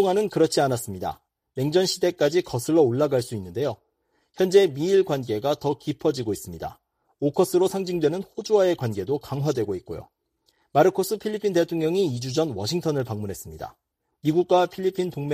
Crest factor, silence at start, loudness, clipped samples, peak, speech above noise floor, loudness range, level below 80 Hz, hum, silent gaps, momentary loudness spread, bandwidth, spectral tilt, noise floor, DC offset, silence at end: 18 dB; 0 s; -24 LUFS; under 0.1%; -4 dBFS; 48 dB; 3 LU; -58 dBFS; none; none; 12 LU; 15.5 kHz; -5.5 dB/octave; -71 dBFS; under 0.1%; 0 s